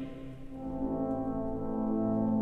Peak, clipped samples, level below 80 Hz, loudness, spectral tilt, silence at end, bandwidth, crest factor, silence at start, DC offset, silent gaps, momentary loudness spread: -20 dBFS; under 0.1%; -48 dBFS; -34 LUFS; -10.5 dB/octave; 0 s; 3.9 kHz; 14 dB; 0 s; under 0.1%; none; 13 LU